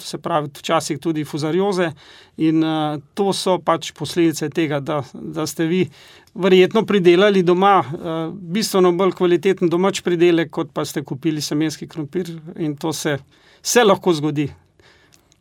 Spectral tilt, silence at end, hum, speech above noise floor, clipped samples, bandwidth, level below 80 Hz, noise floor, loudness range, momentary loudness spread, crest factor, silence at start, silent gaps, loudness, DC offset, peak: -5 dB/octave; 0.85 s; none; 35 dB; under 0.1%; 17 kHz; -62 dBFS; -54 dBFS; 5 LU; 12 LU; 18 dB; 0 s; none; -19 LUFS; under 0.1%; -2 dBFS